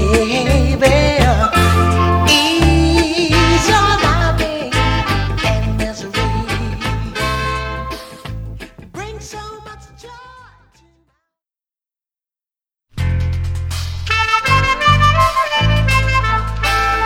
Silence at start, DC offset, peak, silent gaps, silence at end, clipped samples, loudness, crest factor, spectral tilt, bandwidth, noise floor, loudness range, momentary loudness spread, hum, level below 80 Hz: 0 s; under 0.1%; 0 dBFS; none; 0 s; under 0.1%; -14 LUFS; 16 dB; -5 dB/octave; 16.5 kHz; under -90 dBFS; 19 LU; 17 LU; none; -24 dBFS